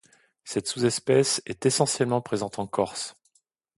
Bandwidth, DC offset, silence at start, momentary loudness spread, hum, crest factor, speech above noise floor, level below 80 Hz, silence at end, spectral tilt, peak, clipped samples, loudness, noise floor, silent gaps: 12 kHz; under 0.1%; 0.45 s; 9 LU; none; 20 dB; 44 dB; -64 dBFS; 0.65 s; -4 dB/octave; -6 dBFS; under 0.1%; -26 LUFS; -70 dBFS; none